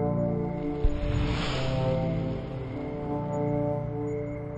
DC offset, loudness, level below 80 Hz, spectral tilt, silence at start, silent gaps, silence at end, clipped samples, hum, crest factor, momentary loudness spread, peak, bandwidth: under 0.1%; -30 LUFS; -36 dBFS; -7.5 dB/octave; 0 s; none; 0 s; under 0.1%; none; 16 dB; 6 LU; -12 dBFS; 9 kHz